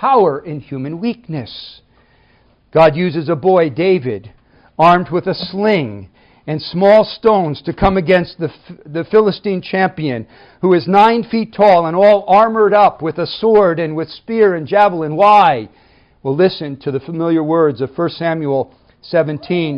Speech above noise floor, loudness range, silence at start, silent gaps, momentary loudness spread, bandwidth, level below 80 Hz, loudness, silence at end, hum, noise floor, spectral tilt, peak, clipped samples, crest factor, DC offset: 39 dB; 5 LU; 0 s; none; 15 LU; 6.6 kHz; -42 dBFS; -14 LUFS; 0 s; none; -53 dBFS; -8 dB/octave; 0 dBFS; under 0.1%; 14 dB; under 0.1%